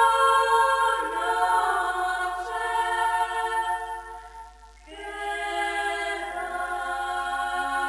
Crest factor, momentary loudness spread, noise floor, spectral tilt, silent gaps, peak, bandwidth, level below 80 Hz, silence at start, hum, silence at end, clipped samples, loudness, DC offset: 16 dB; 16 LU; -47 dBFS; -1.5 dB/octave; none; -8 dBFS; 11 kHz; -52 dBFS; 0 s; none; 0 s; under 0.1%; -25 LUFS; under 0.1%